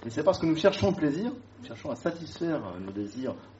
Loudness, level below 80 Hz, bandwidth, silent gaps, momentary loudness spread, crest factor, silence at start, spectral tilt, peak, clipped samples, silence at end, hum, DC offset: -29 LUFS; -58 dBFS; 8 kHz; none; 13 LU; 22 dB; 0 s; -5.5 dB/octave; -8 dBFS; under 0.1%; 0 s; none; under 0.1%